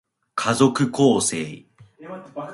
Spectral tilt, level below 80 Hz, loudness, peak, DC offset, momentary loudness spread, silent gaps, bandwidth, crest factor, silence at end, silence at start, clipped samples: -4.5 dB/octave; -62 dBFS; -20 LUFS; -2 dBFS; under 0.1%; 18 LU; none; 11.5 kHz; 20 dB; 0 s; 0.35 s; under 0.1%